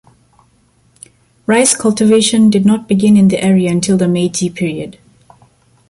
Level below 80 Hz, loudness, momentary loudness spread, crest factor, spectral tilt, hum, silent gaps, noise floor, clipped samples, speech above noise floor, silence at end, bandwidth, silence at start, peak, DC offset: -50 dBFS; -12 LUFS; 10 LU; 14 dB; -5 dB/octave; none; none; -53 dBFS; under 0.1%; 42 dB; 1 s; 11.5 kHz; 1.5 s; 0 dBFS; under 0.1%